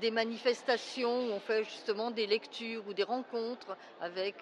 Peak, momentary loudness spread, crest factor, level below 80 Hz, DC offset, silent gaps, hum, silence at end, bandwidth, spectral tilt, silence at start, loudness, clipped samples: -16 dBFS; 8 LU; 20 dB; under -90 dBFS; under 0.1%; none; none; 0 s; 10.5 kHz; -3.5 dB/octave; 0 s; -35 LUFS; under 0.1%